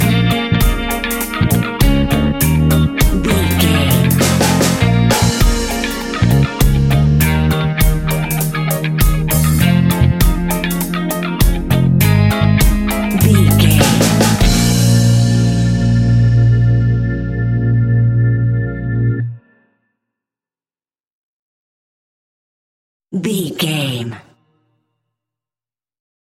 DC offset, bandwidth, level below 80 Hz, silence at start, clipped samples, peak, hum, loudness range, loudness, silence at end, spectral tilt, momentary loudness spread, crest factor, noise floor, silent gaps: under 0.1%; 17 kHz; -22 dBFS; 0 s; under 0.1%; 0 dBFS; none; 11 LU; -14 LUFS; 2.2 s; -5.5 dB/octave; 7 LU; 14 dB; under -90 dBFS; 21.12-23.00 s